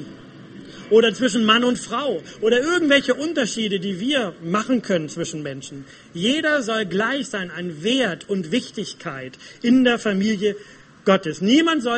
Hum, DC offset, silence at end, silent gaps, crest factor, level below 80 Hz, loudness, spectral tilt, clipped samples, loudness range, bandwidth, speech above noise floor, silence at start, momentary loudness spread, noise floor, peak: none; under 0.1%; 0 s; none; 20 dB; -60 dBFS; -20 LUFS; -4.5 dB/octave; under 0.1%; 4 LU; 8.8 kHz; 20 dB; 0 s; 15 LU; -41 dBFS; 0 dBFS